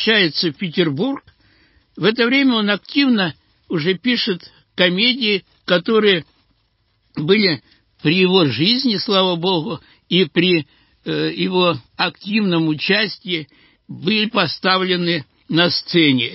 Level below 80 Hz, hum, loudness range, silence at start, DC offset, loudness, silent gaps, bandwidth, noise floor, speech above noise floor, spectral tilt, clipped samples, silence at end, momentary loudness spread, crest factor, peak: -62 dBFS; none; 2 LU; 0 s; under 0.1%; -17 LUFS; none; 5.8 kHz; -64 dBFS; 46 dB; -9 dB/octave; under 0.1%; 0 s; 10 LU; 18 dB; 0 dBFS